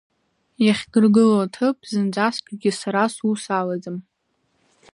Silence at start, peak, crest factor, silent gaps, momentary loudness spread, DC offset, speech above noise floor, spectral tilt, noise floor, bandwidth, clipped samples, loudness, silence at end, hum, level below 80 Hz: 0.6 s; -4 dBFS; 16 dB; none; 10 LU; under 0.1%; 49 dB; -5.5 dB/octave; -69 dBFS; 11 kHz; under 0.1%; -20 LUFS; 0.9 s; none; -66 dBFS